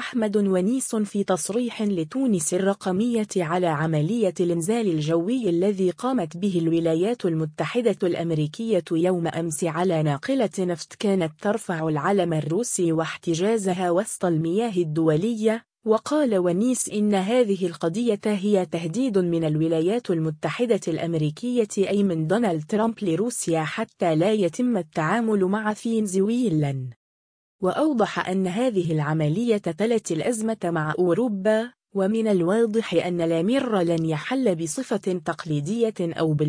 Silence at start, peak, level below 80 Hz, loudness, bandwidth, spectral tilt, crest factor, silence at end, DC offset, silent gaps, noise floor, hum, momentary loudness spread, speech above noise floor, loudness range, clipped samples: 0 s; -8 dBFS; -64 dBFS; -24 LUFS; 10.5 kHz; -6 dB/octave; 16 dB; 0 s; under 0.1%; 26.96-27.59 s; under -90 dBFS; none; 4 LU; over 67 dB; 2 LU; under 0.1%